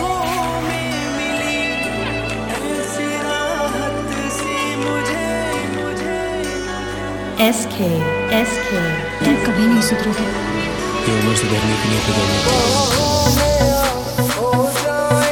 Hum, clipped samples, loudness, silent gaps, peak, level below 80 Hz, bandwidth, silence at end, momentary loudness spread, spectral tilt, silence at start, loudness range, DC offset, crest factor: none; under 0.1%; -18 LUFS; none; -2 dBFS; -34 dBFS; 18 kHz; 0 s; 7 LU; -4 dB/octave; 0 s; 5 LU; under 0.1%; 16 dB